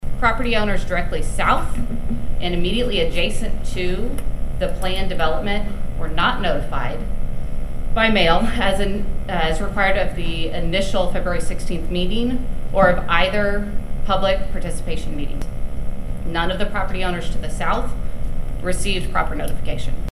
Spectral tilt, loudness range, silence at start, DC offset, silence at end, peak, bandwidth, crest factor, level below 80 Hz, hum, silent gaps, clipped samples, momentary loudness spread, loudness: -5 dB/octave; 5 LU; 0 s; under 0.1%; 0 s; 0 dBFS; 12 kHz; 16 dB; -22 dBFS; none; none; under 0.1%; 12 LU; -22 LUFS